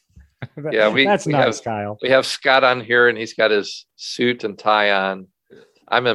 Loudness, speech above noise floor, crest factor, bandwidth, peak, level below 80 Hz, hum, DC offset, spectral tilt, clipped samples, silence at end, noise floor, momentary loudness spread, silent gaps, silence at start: -18 LUFS; 32 dB; 18 dB; 12.5 kHz; -2 dBFS; -60 dBFS; none; under 0.1%; -4 dB/octave; under 0.1%; 0 s; -50 dBFS; 15 LU; none; 0.4 s